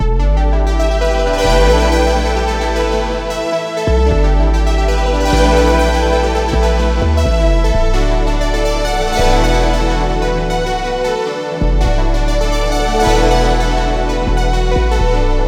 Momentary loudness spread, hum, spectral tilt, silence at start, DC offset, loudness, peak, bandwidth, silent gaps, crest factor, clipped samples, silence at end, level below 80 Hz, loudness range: 5 LU; none; -5.5 dB/octave; 0 s; under 0.1%; -15 LUFS; 0 dBFS; 13 kHz; none; 12 dB; under 0.1%; 0 s; -14 dBFS; 2 LU